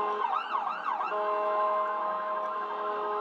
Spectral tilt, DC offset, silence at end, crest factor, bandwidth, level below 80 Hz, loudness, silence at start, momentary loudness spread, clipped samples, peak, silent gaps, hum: -4 dB/octave; under 0.1%; 0 s; 12 dB; 7.2 kHz; under -90 dBFS; -30 LUFS; 0 s; 5 LU; under 0.1%; -18 dBFS; none; none